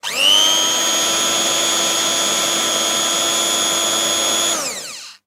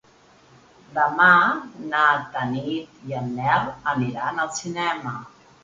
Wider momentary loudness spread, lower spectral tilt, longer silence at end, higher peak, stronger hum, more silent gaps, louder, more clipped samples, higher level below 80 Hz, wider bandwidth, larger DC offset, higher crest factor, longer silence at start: second, 5 LU vs 16 LU; second, 0.5 dB/octave vs -4.5 dB/octave; second, 0.15 s vs 0.35 s; about the same, -2 dBFS vs -2 dBFS; neither; neither; first, -14 LUFS vs -22 LUFS; neither; about the same, -60 dBFS vs -60 dBFS; first, 16 kHz vs 9.4 kHz; neither; about the same, 16 dB vs 20 dB; second, 0.05 s vs 0.9 s